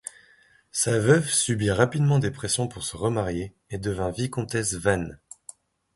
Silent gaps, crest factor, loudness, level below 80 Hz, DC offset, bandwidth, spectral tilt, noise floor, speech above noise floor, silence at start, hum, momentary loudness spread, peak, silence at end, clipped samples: none; 22 dB; -25 LUFS; -48 dBFS; under 0.1%; 12 kHz; -4.5 dB/octave; -58 dBFS; 34 dB; 0.75 s; none; 17 LU; -4 dBFS; 0.8 s; under 0.1%